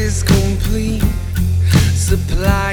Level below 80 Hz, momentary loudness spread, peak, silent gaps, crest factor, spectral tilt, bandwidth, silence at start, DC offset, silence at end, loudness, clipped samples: -20 dBFS; 5 LU; 0 dBFS; none; 14 dB; -5.5 dB/octave; 18 kHz; 0 s; under 0.1%; 0 s; -16 LUFS; under 0.1%